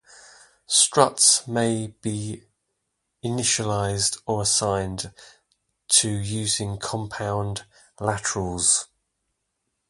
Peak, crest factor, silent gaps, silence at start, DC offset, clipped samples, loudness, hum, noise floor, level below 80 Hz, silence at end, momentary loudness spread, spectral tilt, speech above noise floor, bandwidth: 0 dBFS; 24 dB; none; 0.7 s; under 0.1%; under 0.1%; -22 LUFS; none; -78 dBFS; -50 dBFS; 1.05 s; 15 LU; -2.5 dB/octave; 54 dB; 11.5 kHz